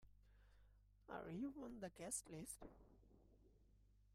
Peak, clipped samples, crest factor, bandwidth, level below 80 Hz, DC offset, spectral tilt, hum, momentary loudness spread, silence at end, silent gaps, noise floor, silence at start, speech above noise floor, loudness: -34 dBFS; under 0.1%; 22 dB; 15 kHz; -72 dBFS; under 0.1%; -4.5 dB/octave; 50 Hz at -70 dBFS; 8 LU; 0 s; none; -73 dBFS; 0 s; 20 dB; -52 LUFS